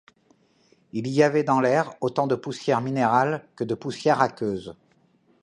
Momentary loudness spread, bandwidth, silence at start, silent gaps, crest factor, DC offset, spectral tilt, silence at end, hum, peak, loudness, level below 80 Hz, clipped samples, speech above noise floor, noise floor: 10 LU; 10.5 kHz; 0.95 s; none; 20 dB; under 0.1%; -6.5 dB/octave; 0.7 s; none; -4 dBFS; -24 LUFS; -66 dBFS; under 0.1%; 39 dB; -62 dBFS